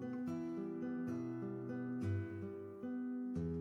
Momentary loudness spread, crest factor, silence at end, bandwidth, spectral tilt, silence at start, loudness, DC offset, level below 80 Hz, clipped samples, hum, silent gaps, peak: 5 LU; 12 dB; 0 s; 7.2 kHz; -9.5 dB/octave; 0 s; -43 LUFS; under 0.1%; -66 dBFS; under 0.1%; none; none; -30 dBFS